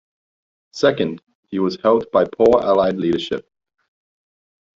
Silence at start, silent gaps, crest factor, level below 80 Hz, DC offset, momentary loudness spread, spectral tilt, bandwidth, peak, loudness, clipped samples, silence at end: 0.75 s; 1.23-1.27 s, 1.35-1.43 s; 18 dB; -54 dBFS; under 0.1%; 14 LU; -6 dB/octave; 7.6 kHz; -2 dBFS; -18 LUFS; under 0.1%; 1.35 s